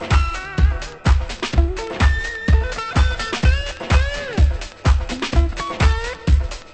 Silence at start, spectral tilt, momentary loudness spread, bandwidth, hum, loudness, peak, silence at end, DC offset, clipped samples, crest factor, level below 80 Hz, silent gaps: 0 s; -5.5 dB/octave; 4 LU; 8.6 kHz; none; -20 LUFS; -2 dBFS; 0.05 s; under 0.1%; under 0.1%; 14 dB; -20 dBFS; none